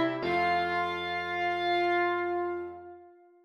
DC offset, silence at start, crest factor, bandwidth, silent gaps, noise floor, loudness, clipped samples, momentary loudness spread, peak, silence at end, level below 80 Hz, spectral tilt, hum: under 0.1%; 0 s; 14 dB; 9.6 kHz; none; -54 dBFS; -29 LUFS; under 0.1%; 12 LU; -16 dBFS; 0.35 s; -66 dBFS; -6 dB/octave; none